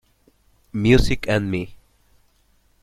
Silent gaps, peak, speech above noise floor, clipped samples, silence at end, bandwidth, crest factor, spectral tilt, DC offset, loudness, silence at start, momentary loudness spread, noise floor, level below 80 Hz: none; -2 dBFS; 42 dB; under 0.1%; 1.05 s; 15.5 kHz; 22 dB; -6.5 dB/octave; under 0.1%; -20 LUFS; 0.75 s; 15 LU; -61 dBFS; -32 dBFS